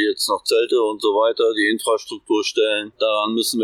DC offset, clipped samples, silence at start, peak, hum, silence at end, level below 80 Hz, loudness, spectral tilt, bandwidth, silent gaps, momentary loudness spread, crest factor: under 0.1%; under 0.1%; 0 s; -6 dBFS; none; 0 s; -72 dBFS; -19 LUFS; -2 dB/octave; 16.5 kHz; none; 4 LU; 12 dB